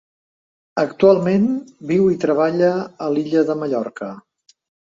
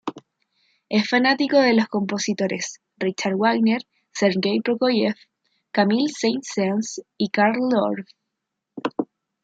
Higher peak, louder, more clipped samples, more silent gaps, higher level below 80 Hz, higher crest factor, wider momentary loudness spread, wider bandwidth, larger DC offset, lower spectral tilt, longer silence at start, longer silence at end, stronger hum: about the same, -2 dBFS vs -4 dBFS; first, -18 LUFS vs -22 LUFS; neither; neither; first, -60 dBFS vs -70 dBFS; about the same, 18 dB vs 18 dB; about the same, 13 LU vs 13 LU; about the same, 7.6 kHz vs 8 kHz; neither; first, -8 dB/octave vs -4.5 dB/octave; first, 0.75 s vs 0.05 s; first, 0.75 s vs 0.4 s; neither